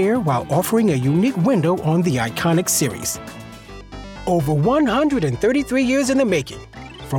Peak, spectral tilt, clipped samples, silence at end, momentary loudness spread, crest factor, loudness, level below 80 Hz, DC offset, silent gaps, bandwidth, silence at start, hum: -6 dBFS; -5.5 dB/octave; under 0.1%; 0 s; 19 LU; 14 dB; -18 LUFS; -44 dBFS; under 0.1%; none; 19 kHz; 0 s; none